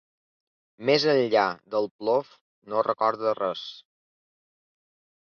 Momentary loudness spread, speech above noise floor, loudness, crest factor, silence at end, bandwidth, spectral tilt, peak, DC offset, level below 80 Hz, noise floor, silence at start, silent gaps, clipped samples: 10 LU; over 65 dB; -25 LUFS; 20 dB; 1.4 s; 6.8 kHz; -5 dB/octave; -8 dBFS; under 0.1%; -74 dBFS; under -90 dBFS; 0.8 s; 1.91-1.99 s, 2.41-2.62 s; under 0.1%